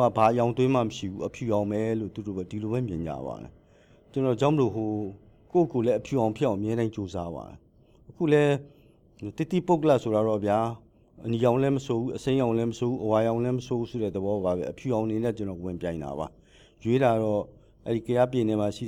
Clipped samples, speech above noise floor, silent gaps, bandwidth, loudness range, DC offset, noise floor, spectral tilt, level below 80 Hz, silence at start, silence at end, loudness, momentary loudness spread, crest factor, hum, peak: under 0.1%; 31 dB; none; 15 kHz; 4 LU; under 0.1%; -57 dBFS; -7.5 dB/octave; -56 dBFS; 0 s; 0 s; -27 LUFS; 12 LU; 18 dB; none; -8 dBFS